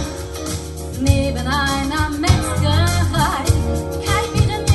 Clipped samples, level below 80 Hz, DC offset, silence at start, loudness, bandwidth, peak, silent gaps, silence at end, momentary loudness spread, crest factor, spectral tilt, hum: under 0.1%; -26 dBFS; under 0.1%; 0 s; -19 LUFS; 12.5 kHz; 0 dBFS; none; 0 s; 9 LU; 18 dB; -5 dB/octave; none